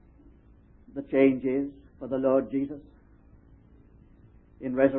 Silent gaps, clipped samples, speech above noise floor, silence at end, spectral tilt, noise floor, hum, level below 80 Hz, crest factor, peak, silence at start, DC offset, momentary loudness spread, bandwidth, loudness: none; under 0.1%; 30 dB; 0 s; -11 dB/octave; -56 dBFS; none; -58 dBFS; 22 dB; -8 dBFS; 0.95 s; under 0.1%; 18 LU; 3.6 kHz; -27 LUFS